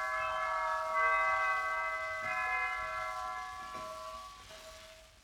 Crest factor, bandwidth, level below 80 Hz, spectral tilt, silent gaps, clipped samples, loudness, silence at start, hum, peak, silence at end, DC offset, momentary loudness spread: 16 dB; 17.5 kHz; -62 dBFS; -1.5 dB/octave; none; under 0.1%; -34 LUFS; 0 s; none; -20 dBFS; 0.05 s; under 0.1%; 20 LU